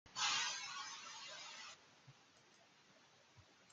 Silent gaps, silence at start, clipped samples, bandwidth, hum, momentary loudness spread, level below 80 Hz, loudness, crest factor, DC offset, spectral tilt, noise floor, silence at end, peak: none; 0.05 s; under 0.1%; 12 kHz; none; 28 LU; under -90 dBFS; -43 LUFS; 22 dB; under 0.1%; 1.5 dB/octave; -69 dBFS; 0 s; -26 dBFS